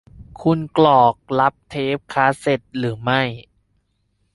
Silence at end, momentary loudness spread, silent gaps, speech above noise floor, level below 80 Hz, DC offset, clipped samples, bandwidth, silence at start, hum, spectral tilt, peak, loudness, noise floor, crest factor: 0.95 s; 11 LU; none; 49 dB; -52 dBFS; under 0.1%; under 0.1%; 11.5 kHz; 0.2 s; none; -6.5 dB/octave; -2 dBFS; -19 LUFS; -67 dBFS; 18 dB